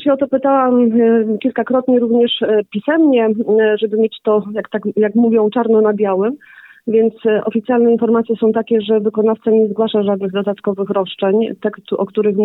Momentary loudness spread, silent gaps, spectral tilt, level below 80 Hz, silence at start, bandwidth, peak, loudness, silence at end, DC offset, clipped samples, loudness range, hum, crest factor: 7 LU; none; -9.5 dB/octave; -64 dBFS; 0 s; 4.1 kHz; -4 dBFS; -15 LUFS; 0 s; under 0.1%; under 0.1%; 2 LU; none; 10 dB